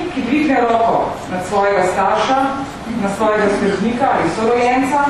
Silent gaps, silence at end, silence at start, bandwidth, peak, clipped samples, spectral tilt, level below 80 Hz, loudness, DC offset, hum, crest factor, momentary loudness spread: none; 0 s; 0 s; 13 kHz; -2 dBFS; under 0.1%; -5.5 dB/octave; -44 dBFS; -16 LUFS; under 0.1%; none; 14 dB; 7 LU